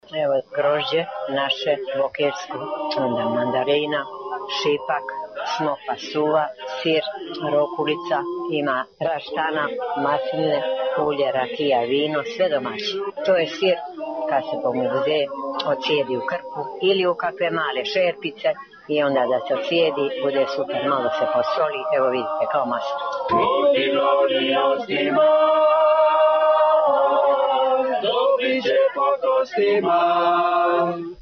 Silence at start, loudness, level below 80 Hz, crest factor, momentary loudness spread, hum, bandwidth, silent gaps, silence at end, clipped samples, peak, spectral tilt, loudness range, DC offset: 0.1 s; -21 LUFS; -68 dBFS; 14 dB; 9 LU; none; 6.6 kHz; none; 0 s; under 0.1%; -8 dBFS; -5 dB/octave; 6 LU; under 0.1%